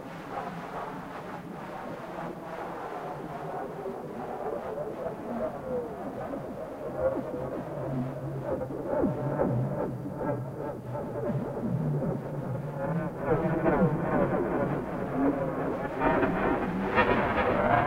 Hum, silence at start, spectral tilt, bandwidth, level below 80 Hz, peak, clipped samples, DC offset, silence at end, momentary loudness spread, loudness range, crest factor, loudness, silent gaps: none; 0 s; -8.5 dB/octave; 16 kHz; -50 dBFS; -10 dBFS; under 0.1%; under 0.1%; 0 s; 12 LU; 9 LU; 20 dB; -31 LUFS; none